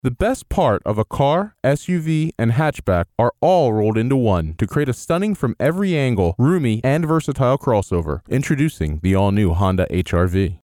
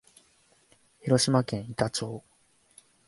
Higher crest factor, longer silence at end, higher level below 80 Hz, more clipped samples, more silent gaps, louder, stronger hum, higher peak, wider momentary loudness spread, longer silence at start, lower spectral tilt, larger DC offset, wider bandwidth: second, 12 dB vs 22 dB; second, 0.05 s vs 0.9 s; first, -36 dBFS vs -62 dBFS; neither; neither; first, -19 LUFS vs -28 LUFS; neither; about the same, -6 dBFS vs -8 dBFS; second, 4 LU vs 16 LU; second, 0.05 s vs 1.05 s; first, -7.5 dB/octave vs -5 dB/octave; neither; first, 16.5 kHz vs 11.5 kHz